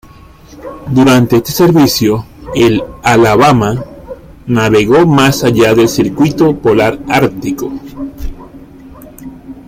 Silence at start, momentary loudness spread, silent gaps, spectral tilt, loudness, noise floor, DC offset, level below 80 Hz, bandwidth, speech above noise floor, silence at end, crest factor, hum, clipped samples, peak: 0.5 s; 21 LU; none; -5.5 dB/octave; -10 LUFS; -33 dBFS; under 0.1%; -34 dBFS; 16 kHz; 24 dB; 0.05 s; 10 dB; none; under 0.1%; 0 dBFS